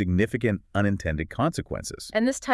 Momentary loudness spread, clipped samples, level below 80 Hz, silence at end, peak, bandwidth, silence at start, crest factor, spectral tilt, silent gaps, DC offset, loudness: 8 LU; under 0.1%; -46 dBFS; 0 s; -8 dBFS; 12 kHz; 0 s; 18 dB; -6 dB/octave; none; under 0.1%; -27 LUFS